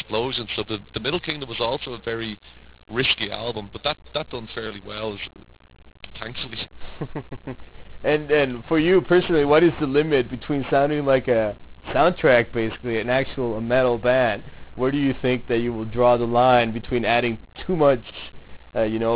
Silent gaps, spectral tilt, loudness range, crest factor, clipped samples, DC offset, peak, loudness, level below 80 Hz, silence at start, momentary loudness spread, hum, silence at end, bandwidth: none; -10 dB/octave; 11 LU; 16 dB; under 0.1%; 0.2%; -6 dBFS; -22 LUFS; -46 dBFS; 0 s; 16 LU; none; 0 s; 4 kHz